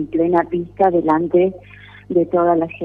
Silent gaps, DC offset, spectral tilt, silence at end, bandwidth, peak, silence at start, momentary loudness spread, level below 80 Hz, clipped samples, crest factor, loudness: none; under 0.1%; -10 dB/octave; 0 s; 3.8 kHz; -2 dBFS; 0 s; 6 LU; -50 dBFS; under 0.1%; 14 dB; -17 LUFS